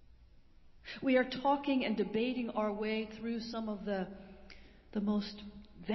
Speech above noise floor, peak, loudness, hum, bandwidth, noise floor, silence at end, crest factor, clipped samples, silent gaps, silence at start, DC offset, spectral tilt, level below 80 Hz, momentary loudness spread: 25 dB; -16 dBFS; -35 LUFS; none; 6 kHz; -59 dBFS; 0 s; 20 dB; under 0.1%; none; 0 s; under 0.1%; -4 dB/octave; -62 dBFS; 21 LU